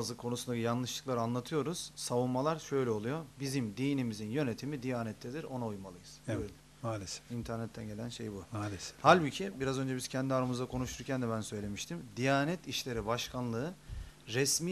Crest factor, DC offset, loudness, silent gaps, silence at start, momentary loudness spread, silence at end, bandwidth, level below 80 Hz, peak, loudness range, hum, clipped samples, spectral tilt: 26 dB; under 0.1%; -35 LUFS; none; 0 s; 11 LU; 0 s; 13.5 kHz; -58 dBFS; -10 dBFS; 8 LU; none; under 0.1%; -4.5 dB/octave